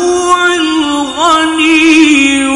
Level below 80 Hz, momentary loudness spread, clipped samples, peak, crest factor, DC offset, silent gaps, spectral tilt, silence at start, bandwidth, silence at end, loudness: -42 dBFS; 6 LU; 0.3%; 0 dBFS; 8 dB; under 0.1%; none; -1.5 dB/octave; 0 s; 11.5 kHz; 0 s; -8 LUFS